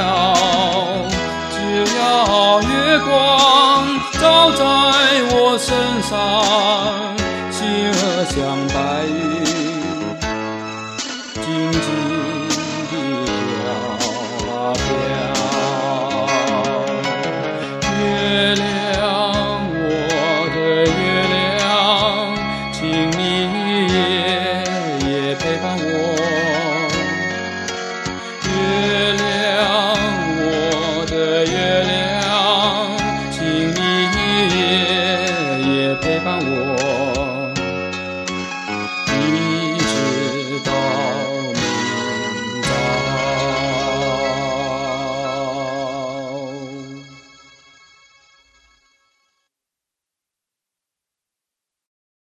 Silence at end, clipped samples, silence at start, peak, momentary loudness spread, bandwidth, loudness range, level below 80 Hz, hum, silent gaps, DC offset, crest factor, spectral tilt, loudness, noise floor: 5.05 s; under 0.1%; 0 s; 0 dBFS; 9 LU; 16 kHz; 8 LU; -40 dBFS; none; none; under 0.1%; 18 dB; -4 dB/octave; -17 LUFS; -85 dBFS